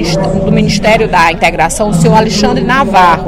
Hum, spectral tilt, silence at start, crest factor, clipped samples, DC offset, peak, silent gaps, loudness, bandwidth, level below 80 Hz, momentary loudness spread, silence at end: none; -5 dB/octave; 0 s; 8 dB; 0.7%; under 0.1%; 0 dBFS; none; -9 LUFS; 15.5 kHz; -24 dBFS; 4 LU; 0 s